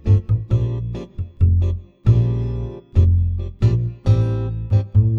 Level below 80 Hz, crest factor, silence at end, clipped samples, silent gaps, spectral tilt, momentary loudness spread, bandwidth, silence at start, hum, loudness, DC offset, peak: -28 dBFS; 14 dB; 0 s; under 0.1%; none; -10 dB/octave; 9 LU; 5.8 kHz; 0.05 s; none; -19 LUFS; under 0.1%; -4 dBFS